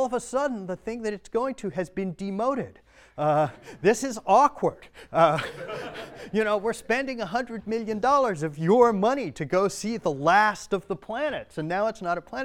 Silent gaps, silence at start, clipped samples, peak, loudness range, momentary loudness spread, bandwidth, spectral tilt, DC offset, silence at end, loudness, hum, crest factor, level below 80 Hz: none; 0 s; under 0.1%; -6 dBFS; 5 LU; 13 LU; 16.5 kHz; -5.5 dB/octave; under 0.1%; 0 s; -26 LUFS; none; 20 dB; -58 dBFS